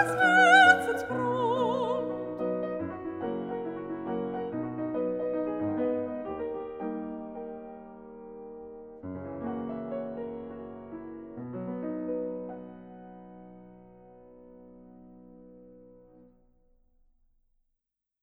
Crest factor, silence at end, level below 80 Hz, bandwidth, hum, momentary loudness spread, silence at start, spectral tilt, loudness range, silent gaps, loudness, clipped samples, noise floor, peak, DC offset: 24 dB; 2.3 s; -64 dBFS; 15 kHz; none; 21 LU; 0 s; -5 dB/octave; 20 LU; none; -28 LUFS; under 0.1%; -84 dBFS; -6 dBFS; under 0.1%